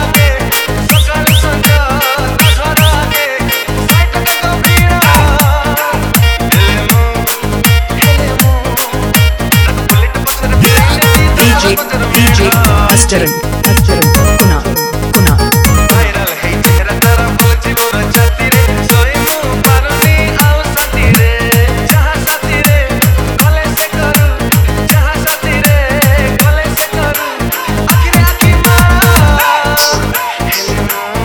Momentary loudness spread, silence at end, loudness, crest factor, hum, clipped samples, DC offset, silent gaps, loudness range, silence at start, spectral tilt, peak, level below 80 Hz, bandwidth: 5 LU; 0 s; -9 LUFS; 8 dB; none; 0.8%; under 0.1%; none; 2 LU; 0 s; -4.5 dB/octave; 0 dBFS; -14 dBFS; over 20 kHz